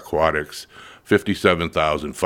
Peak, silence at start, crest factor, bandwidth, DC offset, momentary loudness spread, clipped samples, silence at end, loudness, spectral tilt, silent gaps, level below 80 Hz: 0 dBFS; 0 s; 20 dB; 17.5 kHz; under 0.1%; 16 LU; under 0.1%; 0 s; -20 LUFS; -5 dB/octave; none; -44 dBFS